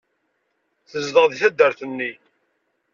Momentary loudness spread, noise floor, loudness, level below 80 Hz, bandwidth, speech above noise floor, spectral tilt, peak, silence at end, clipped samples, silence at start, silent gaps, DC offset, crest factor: 12 LU; -71 dBFS; -19 LUFS; -70 dBFS; 7.4 kHz; 52 dB; -3.5 dB/octave; -2 dBFS; 0.8 s; under 0.1%; 0.95 s; none; under 0.1%; 20 dB